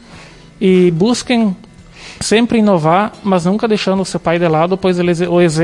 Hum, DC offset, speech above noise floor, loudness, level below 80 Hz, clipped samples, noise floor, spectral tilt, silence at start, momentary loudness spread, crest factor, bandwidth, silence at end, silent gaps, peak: none; under 0.1%; 25 dB; -13 LUFS; -44 dBFS; under 0.1%; -37 dBFS; -6 dB/octave; 0.1 s; 6 LU; 12 dB; 11.5 kHz; 0 s; none; 0 dBFS